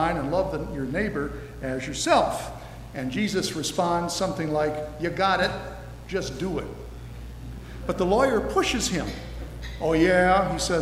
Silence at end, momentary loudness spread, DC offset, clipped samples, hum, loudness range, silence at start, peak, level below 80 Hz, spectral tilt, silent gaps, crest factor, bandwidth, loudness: 0 s; 17 LU; under 0.1%; under 0.1%; none; 4 LU; 0 s; -8 dBFS; -40 dBFS; -4.5 dB/octave; none; 18 dB; 16 kHz; -25 LUFS